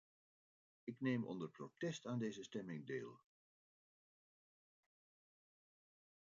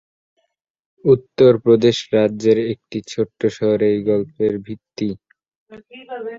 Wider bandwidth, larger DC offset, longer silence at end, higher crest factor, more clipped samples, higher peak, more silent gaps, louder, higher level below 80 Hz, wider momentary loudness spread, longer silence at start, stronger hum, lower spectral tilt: about the same, 7.2 kHz vs 7.8 kHz; neither; first, 3.2 s vs 0 s; about the same, 20 dB vs 16 dB; neither; second, -30 dBFS vs -2 dBFS; second, none vs 5.56-5.66 s; second, -47 LUFS vs -18 LUFS; second, under -90 dBFS vs -56 dBFS; second, 11 LU vs 14 LU; second, 0.85 s vs 1.05 s; neither; about the same, -6 dB/octave vs -6.5 dB/octave